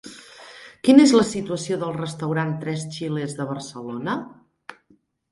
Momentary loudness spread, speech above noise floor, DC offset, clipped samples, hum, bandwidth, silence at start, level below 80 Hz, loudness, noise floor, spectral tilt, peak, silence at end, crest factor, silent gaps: 27 LU; 40 dB; under 0.1%; under 0.1%; none; 11.5 kHz; 0.05 s; -62 dBFS; -22 LUFS; -61 dBFS; -5.5 dB/octave; 0 dBFS; 0.6 s; 22 dB; none